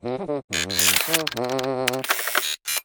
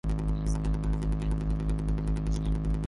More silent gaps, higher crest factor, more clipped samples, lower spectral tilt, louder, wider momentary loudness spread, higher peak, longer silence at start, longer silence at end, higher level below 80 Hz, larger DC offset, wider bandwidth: first, 0.44-0.48 s vs none; first, 22 dB vs 10 dB; neither; second, -1.5 dB/octave vs -8 dB/octave; first, -22 LUFS vs -31 LUFS; first, 8 LU vs 0 LU; first, -2 dBFS vs -18 dBFS; about the same, 0.05 s vs 0.05 s; about the same, 0.05 s vs 0 s; second, -60 dBFS vs -30 dBFS; neither; first, over 20 kHz vs 11.5 kHz